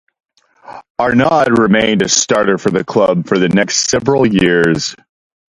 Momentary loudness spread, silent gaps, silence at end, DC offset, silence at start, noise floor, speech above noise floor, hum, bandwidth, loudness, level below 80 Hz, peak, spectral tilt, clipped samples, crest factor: 4 LU; 0.90-0.95 s; 0.55 s; under 0.1%; 0.7 s; -36 dBFS; 24 dB; none; 11.5 kHz; -12 LUFS; -44 dBFS; 0 dBFS; -4 dB/octave; under 0.1%; 14 dB